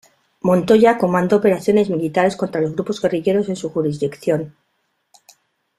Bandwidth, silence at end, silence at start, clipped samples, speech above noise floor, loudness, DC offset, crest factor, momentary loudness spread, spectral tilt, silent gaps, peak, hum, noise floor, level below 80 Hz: 13.5 kHz; 1.3 s; 0.45 s; under 0.1%; 52 dB; -18 LUFS; under 0.1%; 16 dB; 9 LU; -7 dB/octave; none; -2 dBFS; none; -69 dBFS; -58 dBFS